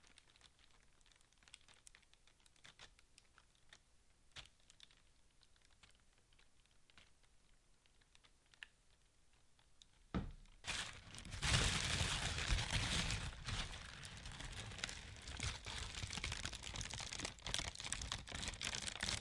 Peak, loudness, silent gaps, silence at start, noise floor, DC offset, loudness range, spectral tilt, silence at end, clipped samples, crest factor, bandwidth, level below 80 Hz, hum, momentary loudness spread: -18 dBFS; -43 LUFS; none; 0.2 s; -72 dBFS; under 0.1%; 25 LU; -2.5 dB/octave; 0 s; under 0.1%; 30 dB; 11.5 kHz; -54 dBFS; none; 24 LU